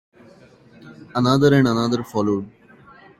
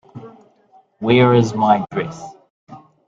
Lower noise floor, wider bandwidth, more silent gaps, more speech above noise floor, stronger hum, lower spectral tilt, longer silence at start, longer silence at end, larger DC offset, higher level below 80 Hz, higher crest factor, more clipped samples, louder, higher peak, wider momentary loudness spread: second, -49 dBFS vs -54 dBFS; first, 14 kHz vs 7.6 kHz; second, none vs 2.50-2.67 s; second, 31 dB vs 38 dB; neither; about the same, -6.5 dB/octave vs -7 dB/octave; first, 0.85 s vs 0.15 s; first, 0.7 s vs 0.3 s; neither; about the same, -54 dBFS vs -56 dBFS; about the same, 18 dB vs 18 dB; neither; second, -19 LUFS vs -16 LUFS; about the same, -4 dBFS vs -2 dBFS; second, 12 LU vs 26 LU